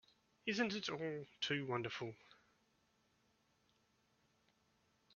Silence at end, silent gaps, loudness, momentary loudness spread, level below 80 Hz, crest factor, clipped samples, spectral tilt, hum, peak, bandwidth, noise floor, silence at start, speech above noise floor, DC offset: 2.8 s; none; -42 LUFS; 9 LU; -84 dBFS; 22 dB; under 0.1%; -3 dB/octave; none; -24 dBFS; 7 kHz; -79 dBFS; 0.45 s; 36 dB; under 0.1%